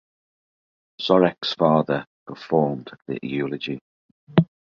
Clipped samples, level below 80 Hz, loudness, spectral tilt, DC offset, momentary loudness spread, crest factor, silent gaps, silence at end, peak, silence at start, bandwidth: under 0.1%; -60 dBFS; -23 LUFS; -8 dB/octave; under 0.1%; 15 LU; 22 dB; 2.07-2.26 s, 3.81-4.27 s; 0.25 s; -2 dBFS; 1 s; 7 kHz